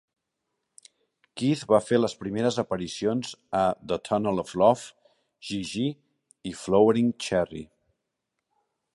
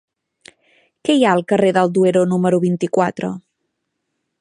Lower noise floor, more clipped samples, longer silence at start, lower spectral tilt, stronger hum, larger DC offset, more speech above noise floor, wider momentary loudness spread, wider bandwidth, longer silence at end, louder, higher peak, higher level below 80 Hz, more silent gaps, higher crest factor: first, -82 dBFS vs -74 dBFS; neither; first, 1.35 s vs 1.05 s; about the same, -5.5 dB/octave vs -6.5 dB/octave; neither; neither; about the same, 57 dB vs 59 dB; first, 17 LU vs 11 LU; about the same, 11.5 kHz vs 11 kHz; first, 1.3 s vs 1 s; second, -26 LUFS vs -17 LUFS; second, -6 dBFS vs -2 dBFS; about the same, -60 dBFS vs -64 dBFS; neither; about the same, 20 dB vs 16 dB